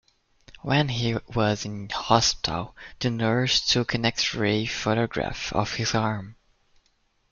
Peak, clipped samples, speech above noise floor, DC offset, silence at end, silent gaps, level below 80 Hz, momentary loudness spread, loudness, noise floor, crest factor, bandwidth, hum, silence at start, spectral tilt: -4 dBFS; under 0.1%; 43 dB; under 0.1%; 1 s; none; -48 dBFS; 10 LU; -25 LUFS; -68 dBFS; 22 dB; 7.4 kHz; none; 0.5 s; -4 dB/octave